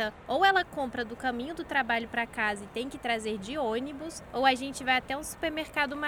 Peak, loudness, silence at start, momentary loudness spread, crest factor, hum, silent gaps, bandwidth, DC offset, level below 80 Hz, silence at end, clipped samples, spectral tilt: -10 dBFS; -30 LUFS; 0 s; 10 LU; 20 dB; none; none; 19.5 kHz; under 0.1%; -56 dBFS; 0 s; under 0.1%; -3 dB/octave